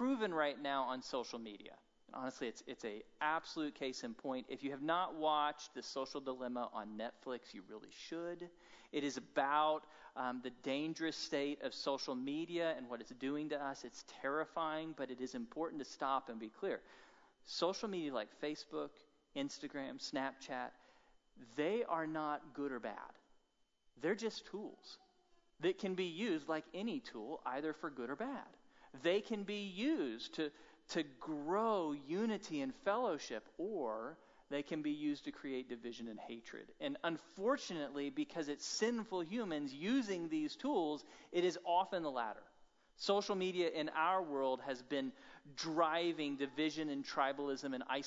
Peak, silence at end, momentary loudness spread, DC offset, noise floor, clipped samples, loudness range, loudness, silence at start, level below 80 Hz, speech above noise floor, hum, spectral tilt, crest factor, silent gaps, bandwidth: -20 dBFS; 0 s; 12 LU; under 0.1%; -79 dBFS; under 0.1%; 5 LU; -41 LUFS; 0 s; -80 dBFS; 37 dB; none; -3 dB/octave; 20 dB; none; 7.6 kHz